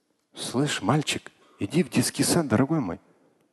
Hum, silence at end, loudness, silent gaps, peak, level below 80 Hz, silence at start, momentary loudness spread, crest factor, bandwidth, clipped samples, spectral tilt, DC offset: none; 0.55 s; -25 LUFS; none; -8 dBFS; -56 dBFS; 0.35 s; 12 LU; 18 dB; 12.5 kHz; under 0.1%; -4.5 dB/octave; under 0.1%